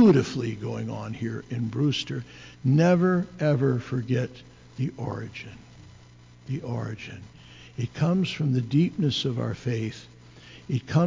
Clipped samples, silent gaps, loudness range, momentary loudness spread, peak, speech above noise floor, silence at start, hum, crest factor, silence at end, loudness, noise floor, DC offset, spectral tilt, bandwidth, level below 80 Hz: under 0.1%; none; 10 LU; 21 LU; -10 dBFS; 25 dB; 0 s; 60 Hz at -45 dBFS; 16 dB; 0 s; -27 LUFS; -51 dBFS; under 0.1%; -7 dB/octave; 7.6 kHz; -56 dBFS